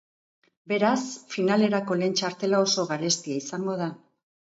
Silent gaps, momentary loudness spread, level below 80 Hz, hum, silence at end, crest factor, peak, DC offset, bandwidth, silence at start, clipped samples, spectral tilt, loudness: none; 8 LU; -74 dBFS; none; 0.55 s; 18 dB; -8 dBFS; under 0.1%; 8 kHz; 0.65 s; under 0.1%; -4 dB/octave; -26 LUFS